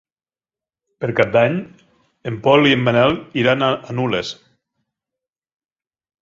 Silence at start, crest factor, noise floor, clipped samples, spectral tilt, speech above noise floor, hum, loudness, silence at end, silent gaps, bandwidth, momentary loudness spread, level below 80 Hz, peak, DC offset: 1 s; 18 dB; under -90 dBFS; under 0.1%; -6.5 dB/octave; over 73 dB; none; -17 LUFS; 1.9 s; none; 7.6 kHz; 15 LU; -54 dBFS; -2 dBFS; under 0.1%